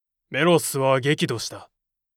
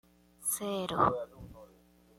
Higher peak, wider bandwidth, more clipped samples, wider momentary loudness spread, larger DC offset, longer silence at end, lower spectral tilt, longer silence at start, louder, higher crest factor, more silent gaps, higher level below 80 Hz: first, -6 dBFS vs -12 dBFS; about the same, 17 kHz vs 16.5 kHz; neither; second, 11 LU vs 21 LU; neither; about the same, 0.5 s vs 0.55 s; about the same, -4.5 dB/octave vs -3.5 dB/octave; about the same, 0.3 s vs 0.4 s; first, -22 LUFS vs -32 LUFS; second, 18 dB vs 24 dB; neither; second, -68 dBFS vs -60 dBFS